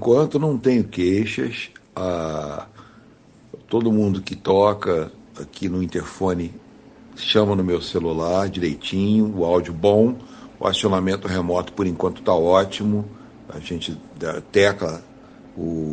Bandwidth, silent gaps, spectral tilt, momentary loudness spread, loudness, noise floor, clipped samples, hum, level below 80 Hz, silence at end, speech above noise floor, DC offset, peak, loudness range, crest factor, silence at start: 9.4 kHz; none; -6 dB/octave; 14 LU; -21 LUFS; -50 dBFS; under 0.1%; none; -52 dBFS; 0 s; 29 dB; under 0.1%; -2 dBFS; 4 LU; 20 dB; 0 s